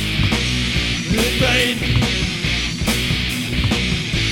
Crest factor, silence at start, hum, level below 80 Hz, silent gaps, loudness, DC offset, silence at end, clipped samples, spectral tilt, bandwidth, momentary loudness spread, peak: 16 dB; 0 s; none; -28 dBFS; none; -18 LUFS; 0.2%; 0 s; under 0.1%; -4 dB/octave; 17.5 kHz; 4 LU; -2 dBFS